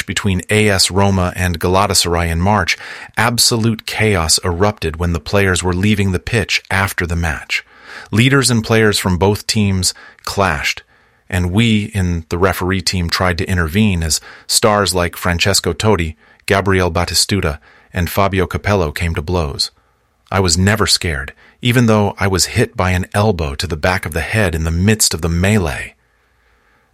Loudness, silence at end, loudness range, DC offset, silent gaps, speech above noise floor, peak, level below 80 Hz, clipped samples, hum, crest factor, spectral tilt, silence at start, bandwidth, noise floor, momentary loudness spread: -15 LUFS; 1.05 s; 2 LU; under 0.1%; none; 42 dB; 0 dBFS; -32 dBFS; under 0.1%; none; 16 dB; -4 dB/octave; 0 s; 16 kHz; -57 dBFS; 8 LU